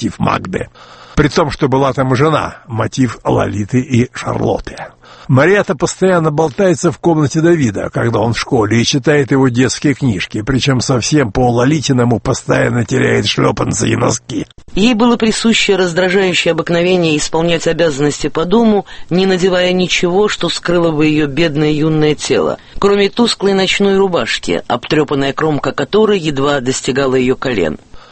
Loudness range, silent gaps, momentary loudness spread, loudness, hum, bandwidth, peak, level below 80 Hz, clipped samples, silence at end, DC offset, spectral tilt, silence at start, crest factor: 2 LU; none; 6 LU; -13 LUFS; none; 8.8 kHz; 0 dBFS; -36 dBFS; under 0.1%; 0.1 s; under 0.1%; -5 dB/octave; 0 s; 12 dB